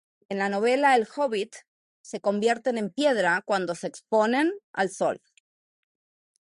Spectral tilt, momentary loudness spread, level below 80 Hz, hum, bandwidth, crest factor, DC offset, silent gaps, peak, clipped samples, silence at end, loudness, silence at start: -4.5 dB/octave; 11 LU; -78 dBFS; none; 11.5 kHz; 18 dB; under 0.1%; 1.67-2.04 s, 4.63-4.74 s; -8 dBFS; under 0.1%; 1.25 s; -25 LUFS; 0.3 s